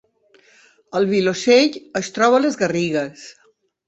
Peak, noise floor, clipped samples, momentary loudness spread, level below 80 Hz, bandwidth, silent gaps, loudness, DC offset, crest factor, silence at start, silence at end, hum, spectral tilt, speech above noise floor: -2 dBFS; -55 dBFS; under 0.1%; 12 LU; -62 dBFS; 8.2 kHz; none; -18 LUFS; under 0.1%; 18 dB; 0.95 s; 0.55 s; none; -4.5 dB/octave; 38 dB